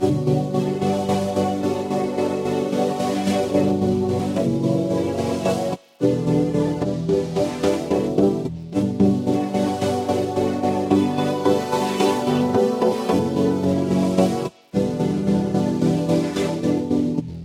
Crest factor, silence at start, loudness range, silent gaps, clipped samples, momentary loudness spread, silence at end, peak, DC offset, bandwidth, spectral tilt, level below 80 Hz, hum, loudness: 16 dB; 0 s; 2 LU; none; under 0.1%; 4 LU; 0 s; -4 dBFS; under 0.1%; 15.5 kHz; -7 dB/octave; -50 dBFS; none; -21 LUFS